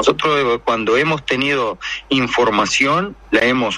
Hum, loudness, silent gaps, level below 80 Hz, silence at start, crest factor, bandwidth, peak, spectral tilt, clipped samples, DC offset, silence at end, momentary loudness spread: none; -16 LUFS; none; -46 dBFS; 0 s; 16 dB; 11 kHz; 0 dBFS; -4 dB/octave; under 0.1%; under 0.1%; 0 s; 5 LU